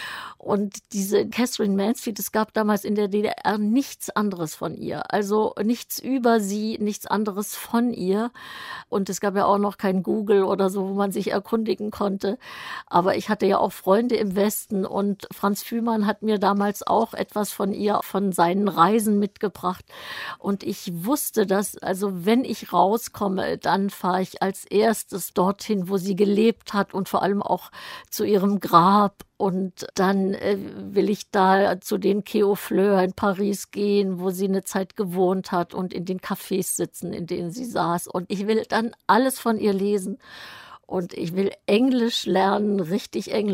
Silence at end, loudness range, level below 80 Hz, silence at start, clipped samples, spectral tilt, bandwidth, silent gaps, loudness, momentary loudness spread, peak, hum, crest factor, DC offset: 0 s; 3 LU; -62 dBFS; 0 s; under 0.1%; -5.5 dB/octave; 16 kHz; none; -23 LUFS; 9 LU; -2 dBFS; none; 20 dB; under 0.1%